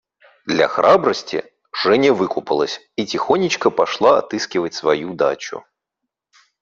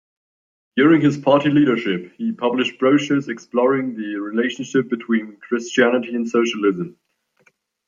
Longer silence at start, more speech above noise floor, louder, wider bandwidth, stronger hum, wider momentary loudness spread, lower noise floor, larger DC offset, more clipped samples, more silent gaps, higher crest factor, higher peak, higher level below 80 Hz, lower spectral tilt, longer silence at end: second, 0.45 s vs 0.75 s; first, 63 dB vs 43 dB; about the same, -18 LUFS vs -19 LUFS; about the same, 7.6 kHz vs 7.4 kHz; neither; first, 13 LU vs 10 LU; first, -80 dBFS vs -61 dBFS; neither; neither; neither; about the same, 18 dB vs 18 dB; about the same, 0 dBFS vs -2 dBFS; about the same, -62 dBFS vs -66 dBFS; second, -4.5 dB/octave vs -6 dB/octave; about the same, 1 s vs 0.95 s